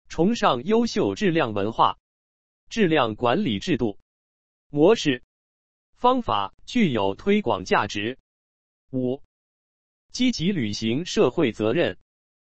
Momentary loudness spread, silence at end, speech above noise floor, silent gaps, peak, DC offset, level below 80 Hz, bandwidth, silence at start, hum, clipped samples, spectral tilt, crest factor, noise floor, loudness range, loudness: 10 LU; 0.45 s; over 68 dB; 2.00-2.67 s, 4.02-4.70 s, 5.24-5.93 s, 6.54-6.58 s, 8.20-8.88 s, 9.25-10.09 s; -6 dBFS; 1%; -52 dBFS; 8.4 kHz; 0.05 s; none; under 0.1%; -5.5 dB/octave; 18 dB; under -90 dBFS; 4 LU; -23 LUFS